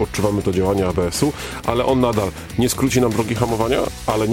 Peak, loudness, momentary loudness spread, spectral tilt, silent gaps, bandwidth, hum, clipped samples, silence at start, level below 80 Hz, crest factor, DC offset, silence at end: -2 dBFS; -19 LUFS; 5 LU; -5.5 dB/octave; none; 17 kHz; none; under 0.1%; 0 s; -36 dBFS; 18 dB; under 0.1%; 0 s